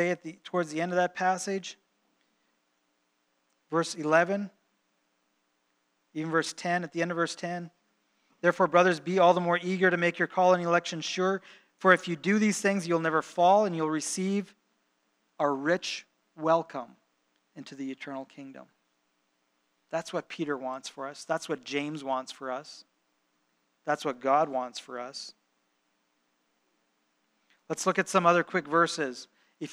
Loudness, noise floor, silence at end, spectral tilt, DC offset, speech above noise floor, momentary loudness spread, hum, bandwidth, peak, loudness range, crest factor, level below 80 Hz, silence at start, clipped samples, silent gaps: -28 LUFS; -75 dBFS; 0 s; -4.5 dB/octave; under 0.1%; 47 dB; 17 LU; none; 13.5 kHz; -6 dBFS; 11 LU; 24 dB; -88 dBFS; 0 s; under 0.1%; none